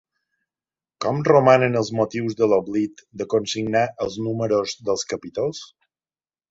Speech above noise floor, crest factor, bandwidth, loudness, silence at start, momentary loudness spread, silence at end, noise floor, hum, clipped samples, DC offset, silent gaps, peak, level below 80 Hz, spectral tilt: over 69 dB; 20 dB; 8 kHz; -21 LUFS; 1 s; 12 LU; 0.85 s; under -90 dBFS; none; under 0.1%; under 0.1%; none; -2 dBFS; -60 dBFS; -5.5 dB/octave